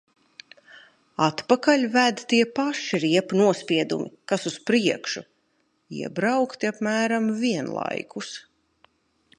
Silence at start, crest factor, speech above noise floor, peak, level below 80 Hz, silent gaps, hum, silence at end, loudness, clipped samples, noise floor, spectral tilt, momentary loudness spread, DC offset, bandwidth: 0.75 s; 22 dB; 46 dB; -4 dBFS; -72 dBFS; none; none; 1 s; -24 LUFS; under 0.1%; -69 dBFS; -4.5 dB/octave; 14 LU; under 0.1%; 11 kHz